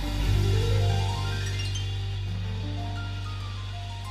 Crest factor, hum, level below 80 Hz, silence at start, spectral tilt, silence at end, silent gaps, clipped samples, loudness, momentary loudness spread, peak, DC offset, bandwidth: 14 dB; none; -34 dBFS; 0 s; -5.5 dB/octave; 0 s; none; under 0.1%; -29 LUFS; 10 LU; -14 dBFS; under 0.1%; 13.5 kHz